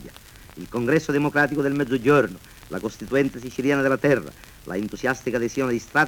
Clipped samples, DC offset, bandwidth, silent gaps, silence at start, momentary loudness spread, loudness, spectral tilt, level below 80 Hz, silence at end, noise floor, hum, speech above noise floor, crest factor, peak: under 0.1%; under 0.1%; 19 kHz; none; 0 s; 14 LU; -23 LUFS; -6 dB/octave; -50 dBFS; 0 s; -45 dBFS; none; 22 dB; 18 dB; -6 dBFS